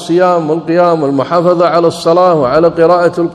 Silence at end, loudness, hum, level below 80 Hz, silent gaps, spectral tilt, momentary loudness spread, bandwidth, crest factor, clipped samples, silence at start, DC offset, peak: 0 s; -10 LUFS; none; -48 dBFS; none; -7 dB/octave; 3 LU; 11.5 kHz; 10 dB; 0.7%; 0 s; under 0.1%; 0 dBFS